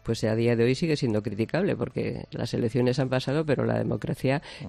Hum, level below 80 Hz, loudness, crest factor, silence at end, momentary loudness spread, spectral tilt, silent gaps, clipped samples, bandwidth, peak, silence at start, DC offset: none; -54 dBFS; -27 LUFS; 16 dB; 0 s; 6 LU; -7 dB/octave; none; under 0.1%; 13 kHz; -10 dBFS; 0.05 s; under 0.1%